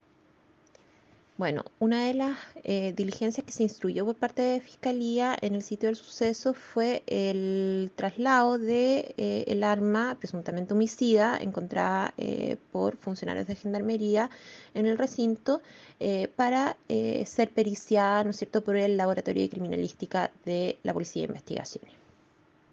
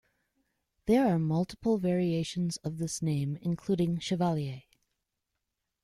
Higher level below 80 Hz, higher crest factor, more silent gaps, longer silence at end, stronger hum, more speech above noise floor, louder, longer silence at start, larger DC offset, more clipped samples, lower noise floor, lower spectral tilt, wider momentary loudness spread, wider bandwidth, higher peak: second, -72 dBFS vs -60 dBFS; about the same, 18 dB vs 18 dB; neither; second, 0.95 s vs 1.25 s; neither; second, 34 dB vs 55 dB; about the same, -29 LUFS vs -30 LUFS; first, 1.4 s vs 0.85 s; neither; neither; second, -63 dBFS vs -84 dBFS; about the same, -6 dB/octave vs -6.5 dB/octave; about the same, 8 LU vs 8 LU; second, 8 kHz vs 13.5 kHz; first, -10 dBFS vs -14 dBFS